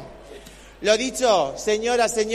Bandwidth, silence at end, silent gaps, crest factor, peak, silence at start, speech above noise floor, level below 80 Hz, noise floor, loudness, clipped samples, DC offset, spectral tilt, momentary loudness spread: 14.5 kHz; 0 s; none; 18 dB; -4 dBFS; 0 s; 22 dB; -50 dBFS; -43 dBFS; -21 LUFS; under 0.1%; under 0.1%; -2 dB/octave; 22 LU